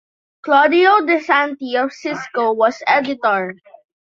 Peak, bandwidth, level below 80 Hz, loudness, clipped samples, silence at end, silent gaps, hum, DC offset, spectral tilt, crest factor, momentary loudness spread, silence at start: -2 dBFS; 7.4 kHz; -68 dBFS; -16 LUFS; under 0.1%; 0.6 s; none; none; under 0.1%; -4.5 dB/octave; 16 dB; 11 LU; 0.45 s